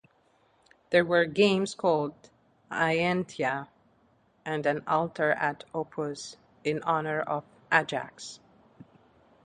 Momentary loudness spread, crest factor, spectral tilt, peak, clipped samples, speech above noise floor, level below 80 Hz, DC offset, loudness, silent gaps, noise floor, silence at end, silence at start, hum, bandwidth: 13 LU; 24 dB; -5 dB/octave; -6 dBFS; under 0.1%; 38 dB; -70 dBFS; under 0.1%; -28 LUFS; none; -66 dBFS; 1.1 s; 0.9 s; none; 10.5 kHz